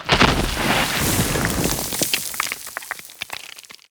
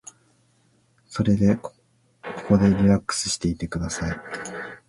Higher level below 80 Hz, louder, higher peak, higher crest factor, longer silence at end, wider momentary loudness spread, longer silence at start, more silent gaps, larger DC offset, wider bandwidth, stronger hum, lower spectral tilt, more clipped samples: first, -34 dBFS vs -42 dBFS; first, -20 LUFS vs -23 LUFS; first, 0 dBFS vs -4 dBFS; about the same, 22 dB vs 20 dB; about the same, 0.2 s vs 0.15 s; about the same, 15 LU vs 17 LU; second, 0 s vs 1.1 s; neither; neither; first, over 20 kHz vs 11.5 kHz; neither; second, -3 dB/octave vs -5.5 dB/octave; neither